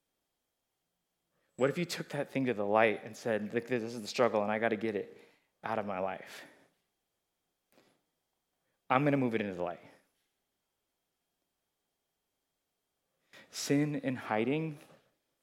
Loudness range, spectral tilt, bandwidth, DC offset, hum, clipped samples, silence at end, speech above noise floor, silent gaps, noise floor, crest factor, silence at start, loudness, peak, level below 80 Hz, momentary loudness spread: 11 LU; -5.5 dB/octave; 16.5 kHz; under 0.1%; none; under 0.1%; 0.65 s; 52 dB; none; -85 dBFS; 26 dB; 1.6 s; -33 LUFS; -10 dBFS; -86 dBFS; 14 LU